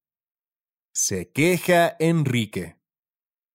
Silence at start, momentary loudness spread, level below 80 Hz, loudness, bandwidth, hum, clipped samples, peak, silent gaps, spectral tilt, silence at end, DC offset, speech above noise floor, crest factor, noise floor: 0.95 s; 12 LU; -62 dBFS; -22 LUFS; 16 kHz; none; under 0.1%; -6 dBFS; none; -4.5 dB/octave; 0.85 s; under 0.1%; over 69 dB; 18 dB; under -90 dBFS